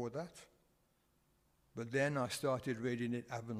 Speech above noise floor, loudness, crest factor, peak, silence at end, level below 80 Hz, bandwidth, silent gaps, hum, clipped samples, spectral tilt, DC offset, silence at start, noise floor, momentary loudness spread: 37 dB; -39 LUFS; 18 dB; -22 dBFS; 0 s; -74 dBFS; 15.5 kHz; none; none; under 0.1%; -5.5 dB/octave; under 0.1%; 0 s; -76 dBFS; 15 LU